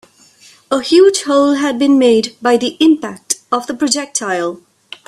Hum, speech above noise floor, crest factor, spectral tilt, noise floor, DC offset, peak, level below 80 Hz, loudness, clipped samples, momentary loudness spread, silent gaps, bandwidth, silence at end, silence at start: none; 33 dB; 14 dB; -2.5 dB/octave; -46 dBFS; under 0.1%; 0 dBFS; -58 dBFS; -13 LUFS; under 0.1%; 10 LU; none; 13.5 kHz; 0.5 s; 0.7 s